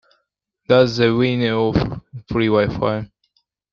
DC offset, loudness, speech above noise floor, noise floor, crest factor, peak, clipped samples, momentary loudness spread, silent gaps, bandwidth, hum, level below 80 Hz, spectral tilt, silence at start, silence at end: under 0.1%; -18 LUFS; 55 dB; -72 dBFS; 18 dB; -2 dBFS; under 0.1%; 12 LU; none; 7.2 kHz; none; -44 dBFS; -7 dB/octave; 0.7 s; 0.65 s